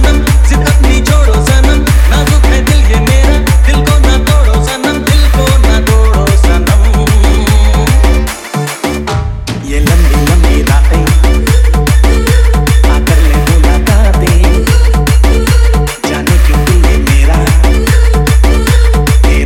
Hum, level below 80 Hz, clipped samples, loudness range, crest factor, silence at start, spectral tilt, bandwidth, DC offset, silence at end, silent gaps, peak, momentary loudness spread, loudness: none; -8 dBFS; 0.9%; 2 LU; 6 dB; 0 s; -5.5 dB/octave; 16 kHz; under 0.1%; 0 s; none; 0 dBFS; 4 LU; -9 LUFS